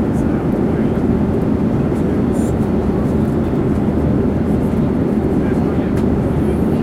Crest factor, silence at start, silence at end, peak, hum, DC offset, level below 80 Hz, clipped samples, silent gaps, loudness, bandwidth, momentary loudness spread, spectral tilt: 10 dB; 0 s; 0 s; -6 dBFS; none; under 0.1%; -28 dBFS; under 0.1%; none; -16 LUFS; 13.5 kHz; 1 LU; -9 dB/octave